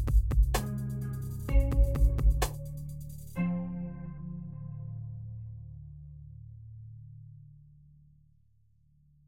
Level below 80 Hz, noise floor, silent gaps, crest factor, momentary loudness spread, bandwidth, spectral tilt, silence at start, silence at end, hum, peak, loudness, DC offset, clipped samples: -32 dBFS; -67 dBFS; none; 18 dB; 21 LU; 16.5 kHz; -6.5 dB/octave; 0 s; 1.65 s; none; -12 dBFS; -33 LUFS; under 0.1%; under 0.1%